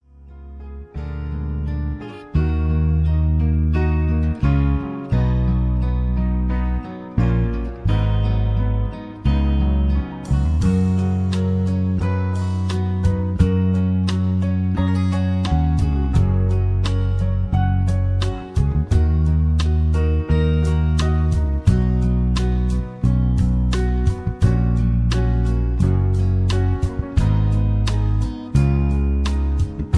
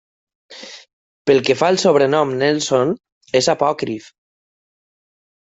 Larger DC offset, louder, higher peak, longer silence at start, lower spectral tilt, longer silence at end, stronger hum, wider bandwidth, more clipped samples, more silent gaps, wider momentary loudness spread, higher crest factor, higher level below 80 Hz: neither; second, -20 LUFS vs -17 LUFS; about the same, -2 dBFS vs -2 dBFS; second, 0.2 s vs 0.5 s; first, -8 dB/octave vs -4.5 dB/octave; second, 0 s vs 1.4 s; neither; first, 10.5 kHz vs 8.2 kHz; neither; second, none vs 0.93-1.25 s, 3.12-3.21 s; second, 5 LU vs 19 LU; about the same, 16 dB vs 18 dB; first, -22 dBFS vs -62 dBFS